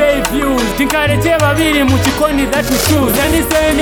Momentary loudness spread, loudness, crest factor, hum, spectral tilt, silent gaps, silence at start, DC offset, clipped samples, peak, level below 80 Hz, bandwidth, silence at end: 3 LU; -12 LUFS; 12 dB; none; -4.5 dB/octave; none; 0 s; under 0.1%; under 0.1%; 0 dBFS; -26 dBFS; 19.5 kHz; 0 s